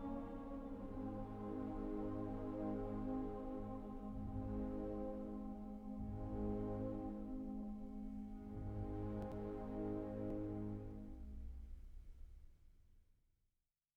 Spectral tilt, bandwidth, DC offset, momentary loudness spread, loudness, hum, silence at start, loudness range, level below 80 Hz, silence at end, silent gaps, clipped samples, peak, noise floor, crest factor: -10 dB/octave; 7.8 kHz; under 0.1%; 10 LU; -47 LUFS; none; 0 s; 4 LU; -54 dBFS; 0.95 s; none; under 0.1%; -32 dBFS; -89 dBFS; 14 dB